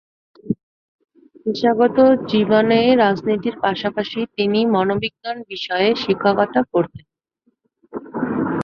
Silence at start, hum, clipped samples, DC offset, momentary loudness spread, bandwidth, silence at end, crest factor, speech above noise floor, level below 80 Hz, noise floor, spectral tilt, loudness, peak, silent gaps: 0.45 s; none; under 0.1%; under 0.1%; 13 LU; 6.6 kHz; 0 s; 18 dB; 49 dB; -56 dBFS; -66 dBFS; -7 dB/octave; -18 LUFS; -2 dBFS; 0.63-0.99 s